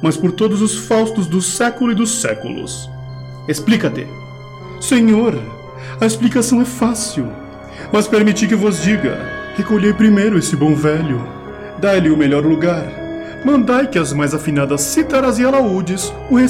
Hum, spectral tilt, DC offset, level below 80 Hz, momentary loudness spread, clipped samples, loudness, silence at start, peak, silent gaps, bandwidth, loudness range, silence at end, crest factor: none; -5 dB/octave; under 0.1%; -42 dBFS; 16 LU; under 0.1%; -15 LUFS; 0 s; -2 dBFS; none; 16 kHz; 3 LU; 0 s; 14 dB